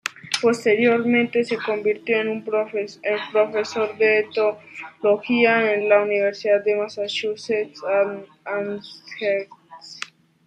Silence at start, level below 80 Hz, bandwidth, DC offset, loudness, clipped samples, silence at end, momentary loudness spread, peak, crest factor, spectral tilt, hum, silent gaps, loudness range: 0.05 s; -74 dBFS; 11 kHz; under 0.1%; -21 LUFS; under 0.1%; 0.4 s; 16 LU; -4 dBFS; 18 dB; -4 dB/octave; none; none; 5 LU